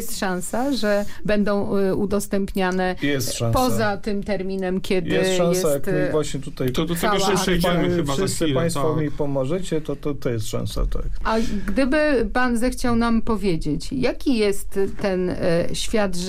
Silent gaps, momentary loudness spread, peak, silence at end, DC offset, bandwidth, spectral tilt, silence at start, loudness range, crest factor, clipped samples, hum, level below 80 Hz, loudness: none; 6 LU; -10 dBFS; 0 s; under 0.1%; 16 kHz; -5 dB/octave; 0 s; 2 LU; 12 dB; under 0.1%; none; -34 dBFS; -22 LUFS